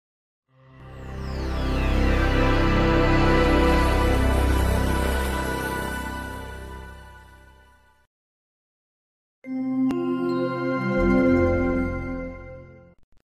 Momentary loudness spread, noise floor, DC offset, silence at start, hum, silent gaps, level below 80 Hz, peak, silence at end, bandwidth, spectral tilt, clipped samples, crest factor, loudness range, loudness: 18 LU; -56 dBFS; under 0.1%; 0.8 s; none; 8.07-9.42 s; -28 dBFS; -8 dBFS; 0.6 s; 14 kHz; -6.5 dB/octave; under 0.1%; 16 dB; 14 LU; -23 LUFS